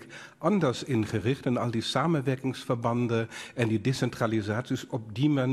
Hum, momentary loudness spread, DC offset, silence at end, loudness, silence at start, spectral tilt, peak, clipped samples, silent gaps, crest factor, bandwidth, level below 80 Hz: none; 6 LU; under 0.1%; 0 s; -29 LUFS; 0 s; -6.5 dB/octave; -10 dBFS; under 0.1%; none; 18 dB; 13 kHz; -62 dBFS